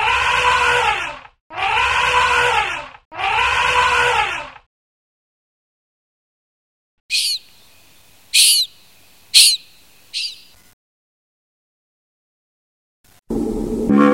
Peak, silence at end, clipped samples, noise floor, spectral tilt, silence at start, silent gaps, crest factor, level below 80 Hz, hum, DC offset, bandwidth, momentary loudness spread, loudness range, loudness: 0 dBFS; 0 s; under 0.1%; -51 dBFS; -1.5 dB/octave; 0 s; 1.41-1.50 s, 3.05-3.11 s, 4.66-7.09 s, 10.73-13.04 s; 20 dB; -42 dBFS; none; under 0.1%; 16.5 kHz; 17 LU; 15 LU; -15 LUFS